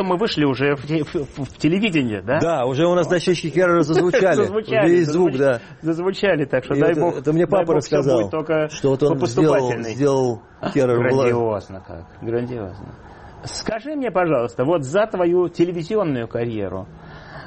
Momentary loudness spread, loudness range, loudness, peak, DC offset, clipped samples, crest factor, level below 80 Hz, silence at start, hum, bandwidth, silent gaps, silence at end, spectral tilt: 12 LU; 5 LU; -19 LUFS; -6 dBFS; under 0.1%; under 0.1%; 12 dB; -50 dBFS; 0 s; none; 8.8 kHz; none; 0 s; -6.5 dB/octave